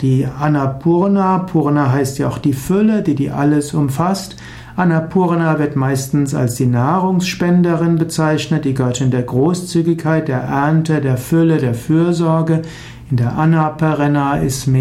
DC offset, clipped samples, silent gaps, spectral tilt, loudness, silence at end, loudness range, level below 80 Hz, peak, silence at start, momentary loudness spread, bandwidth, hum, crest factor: under 0.1%; under 0.1%; none; -7 dB/octave; -15 LUFS; 0 s; 1 LU; -44 dBFS; -2 dBFS; 0 s; 4 LU; 15 kHz; none; 12 dB